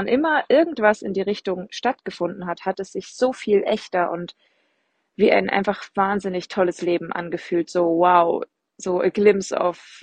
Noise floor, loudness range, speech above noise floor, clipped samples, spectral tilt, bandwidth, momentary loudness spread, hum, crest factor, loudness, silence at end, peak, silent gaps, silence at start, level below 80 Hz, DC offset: -70 dBFS; 4 LU; 49 dB; under 0.1%; -5.5 dB/octave; 9.2 kHz; 11 LU; none; 20 dB; -21 LUFS; 0.05 s; -2 dBFS; none; 0 s; -62 dBFS; under 0.1%